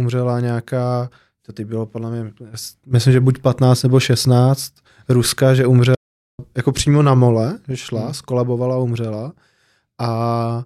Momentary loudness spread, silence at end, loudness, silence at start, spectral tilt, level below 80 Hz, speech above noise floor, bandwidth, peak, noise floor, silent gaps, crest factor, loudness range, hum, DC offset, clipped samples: 16 LU; 0 s; -17 LUFS; 0 s; -6.5 dB/octave; -48 dBFS; 45 dB; 14.5 kHz; -4 dBFS; -61 dBFS; 5.97-6.38 s; 14 dB; 5 LU; none; under 0.1%; under 0.1%